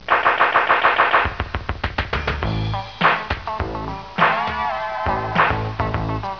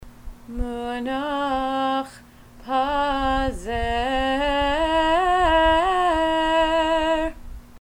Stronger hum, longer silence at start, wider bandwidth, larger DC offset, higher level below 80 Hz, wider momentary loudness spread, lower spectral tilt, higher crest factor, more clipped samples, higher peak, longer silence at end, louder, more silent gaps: neither; about the same, 0 s vs 0 s; second, 5.4 kHz vs 16 kHz; first, 0.4% vs under 0.1%; about the same, -34 dBFS vs -36 dBFS; about the same, 11 LU vs 10 LU; first, -6.5 dB/octave vs -4.5 dB/octave; about the same, 18 dB vs 16 dB; neither; first, -2 dBFS vs -6 dBFS; about the same, 0 s vs 0.05 s; about the same, -20 LUFS vs -22 LUFS; neither